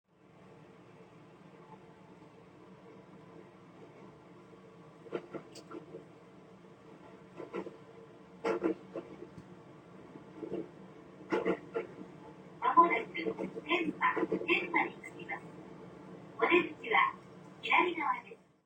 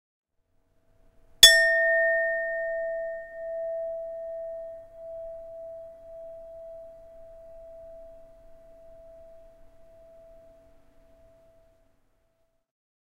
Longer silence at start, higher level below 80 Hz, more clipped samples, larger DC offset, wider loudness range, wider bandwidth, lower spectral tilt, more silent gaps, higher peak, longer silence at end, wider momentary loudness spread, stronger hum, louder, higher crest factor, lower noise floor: second, 0.6 s vs 1.4 s; second, -76 dBFS vs -58 dBFS; neither; neither; about the same, 24 LU vs 25 LU; first, 18.5 kHz vs 16 kHz; first, -5.5 dB/octave vs 2 dB/octave; neither; second, -12 dBFS vs 0 dBFS; second, 0.3 s vs 3.15 s; second, 27 LU vs 30 LU; neither; second, -33 LUFS vs -22 LUFS; second, 24 dB vs 30 dB; second, -59 dBFS vs -71 dBFS